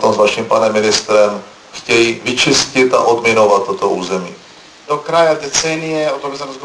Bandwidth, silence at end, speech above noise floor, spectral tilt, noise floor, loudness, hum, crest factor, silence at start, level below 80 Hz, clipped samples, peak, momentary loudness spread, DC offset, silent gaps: 11 kHz; 0 s; 25 dB; -3 dB/octave; -39 dBFS; -13 LUFS; none; 14 dB; 0 s; -50 dBFS; under 0.1%; 0 dBFS; 11 LU; under 0.1%; none